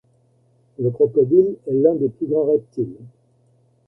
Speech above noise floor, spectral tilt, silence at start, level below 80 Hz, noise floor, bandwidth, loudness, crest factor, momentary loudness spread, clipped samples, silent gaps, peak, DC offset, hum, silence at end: 41 dB; -13 dB/octave; 0.8 s; -62 dBFS; -59 dBFS; 1.6 kHz; -19 LUFS; 18 dB; 11 LU; under 0.1%; none; -2 dBFS; under 0.1%; none; 0.8 s